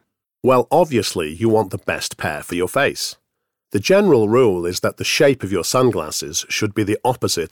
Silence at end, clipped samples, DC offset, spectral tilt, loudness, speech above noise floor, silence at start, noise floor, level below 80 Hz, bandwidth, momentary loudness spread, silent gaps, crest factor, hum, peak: 0.05 s; under 0.1%; under 0.1%; -4.5 dB/octave; -18 LUFS; 59 dB; 0.45 s; -77 dBFS; -52 dBFS; 19 kHz; 9 LU; none; 16 dB; none; -4 dBFS